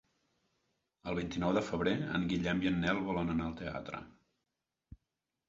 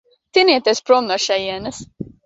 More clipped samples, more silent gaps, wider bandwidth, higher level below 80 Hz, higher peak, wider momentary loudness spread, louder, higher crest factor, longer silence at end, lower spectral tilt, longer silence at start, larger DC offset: neither; neither; about the same, 7.6 kHz vs 8 kHz; about the same, -56 dBFS vs -54 dBFS; second, -16 dBFS vs -2 dBFS; second, 10 LU vs 17 LU; second, -35 LUFS vs -16 LUFS; about the same, 20 dB vs 16 dB; first, 0.55 s vs 0.2 s; first, -5 dB/octave vs -3 dB/octave; first, 1.05 s vs 0.35 s; neither